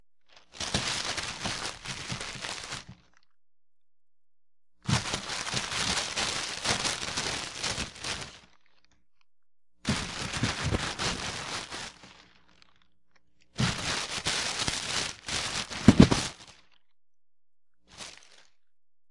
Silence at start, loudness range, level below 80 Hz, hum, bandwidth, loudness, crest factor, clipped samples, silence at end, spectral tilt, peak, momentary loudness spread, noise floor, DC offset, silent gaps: 0 s; 9 LU; -48 dBFS; none; 11.5 kHz; -29 LUFS; 32 dB; under 0.1%; 0 s; -3.5 dB/octave; 0 dBFS; 11 LU; -75 dBFS; under 0.1%; none